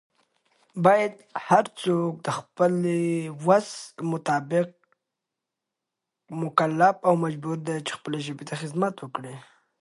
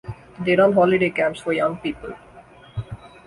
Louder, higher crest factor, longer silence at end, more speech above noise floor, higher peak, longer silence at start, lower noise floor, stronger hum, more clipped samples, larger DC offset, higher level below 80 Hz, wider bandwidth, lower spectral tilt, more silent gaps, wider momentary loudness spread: second, -25 LUFS vs -20 LUFS; about the same, 22 dB vs 18 dB; first, 0.4 s vs 0.2 s; first, 61 dB vs 27 dB; about the same, -4 dBFS vs -4 dBFS; first, 0.75 s vs 0.05 s; first, -86 dBFS vs -46 dBFS; neither; neither; neither; second, -74 dBFS vs -50 dBFS; about the same, 11.5 kHz vs 11.5 kHz; about the same, -6 dB/octave vs -7 dB/octave; neither; second, 15 LU vs 21 LU